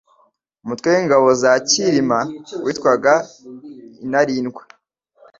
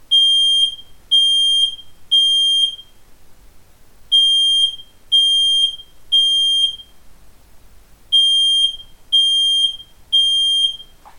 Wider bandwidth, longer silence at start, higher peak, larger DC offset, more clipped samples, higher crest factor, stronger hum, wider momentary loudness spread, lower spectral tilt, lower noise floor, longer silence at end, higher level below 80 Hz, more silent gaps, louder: second, 7.8 kHz vs 17 kHz; first, 0.65 s vs 0.1 s; first, -2 dBFS vs -6 dBFS; neither; neither; about the same, 16 dB vs 12 dB; neither; first, 20 LU vs 8 LU; first, -3.5 dB/octave vs 2.5 dB/octave; first, -60 dBFS vs -43 dBFS; first, 0.8 s vs 0.35 s; second, -60 dBFS vs -50 dBFS; neither; second, -17 LUFS vs -13 LUFS